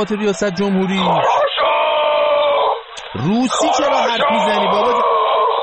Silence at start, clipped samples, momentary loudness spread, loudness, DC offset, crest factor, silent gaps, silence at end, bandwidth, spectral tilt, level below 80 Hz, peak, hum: 0 s; under 0.1%; 4 LU; -15 LUFS; under 0.1%; 10 dB; none; 0 s; 8.8 kHz; -4.5 dB/octave; -52 dBFS; -4 dBFS; none